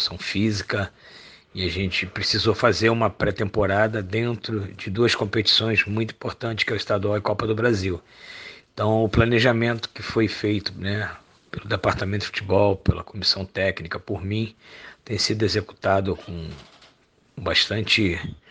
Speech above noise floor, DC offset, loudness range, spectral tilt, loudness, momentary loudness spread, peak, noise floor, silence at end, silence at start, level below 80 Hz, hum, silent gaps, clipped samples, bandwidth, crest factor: 36 dB; under 0.1%; 3 LU; -5 dB/octave; -23 LUFS; 13 LU; -2 dBFS; -59 dBFS; 0.15 s; 0 s; -44 dBFS; none; none; under 0.1%; 9.6 kHz; 22 dB